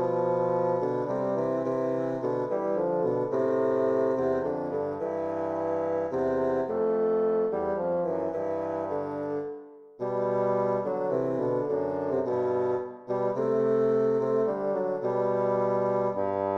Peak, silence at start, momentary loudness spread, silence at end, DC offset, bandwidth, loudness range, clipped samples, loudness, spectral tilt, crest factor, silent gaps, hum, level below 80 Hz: -16 dBFS; 0 s; 6 LU; 0 s; under 0.1%; 6.8 kHz; 3 LU; under 0.1%; -28 LUFS; -9 dB/octave; 12 dB; none; none; -66 dBFS